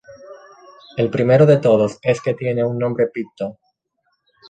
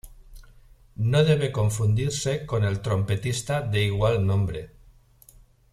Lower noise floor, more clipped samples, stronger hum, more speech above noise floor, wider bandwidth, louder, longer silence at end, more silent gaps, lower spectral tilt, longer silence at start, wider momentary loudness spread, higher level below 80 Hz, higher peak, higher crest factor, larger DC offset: first, -70 dBFS vs -54 dBFS; neither; neither; first, 53 dB vs 31 dB; second, 9.2 kHz vs 13.5 kHz; first, -17 LUFS vs -24 LUFS; about the same, 0.95 s vs 1.05 s; neither; first, -8 dB/octave vs -6 dB/octave; about the same, 0.1 s vs 0.05 s; first, 16 LU vs 6 LU; second, -56 dBFS vs -46 dBFS; first, -2 dBFS vs -8 dBFS; about the same, 18 dB vs 18 dB; neither